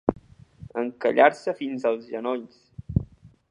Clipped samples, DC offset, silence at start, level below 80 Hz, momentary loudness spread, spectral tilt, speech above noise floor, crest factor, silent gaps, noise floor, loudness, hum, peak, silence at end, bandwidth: under 0.1%; under 0.1%; 0.05 s; -46 dBFS; 19 LU; -7.5 dB/octave; 23 dB; 24 dB; none; -47 dBFS; -25 LUFS; none; -2 dBFS; 0.45 s; 10.5 kHz